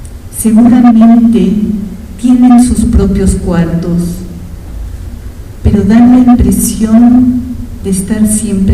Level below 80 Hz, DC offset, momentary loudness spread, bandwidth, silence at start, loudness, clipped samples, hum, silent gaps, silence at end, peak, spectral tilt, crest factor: -20 dBFS; under 0.1%; 20 LU; 14.5 kHz; 0 s; -7 LUFS; 3%; none; none; 0 s; 0 dBFS; -6.5 dB/octave; 8 dB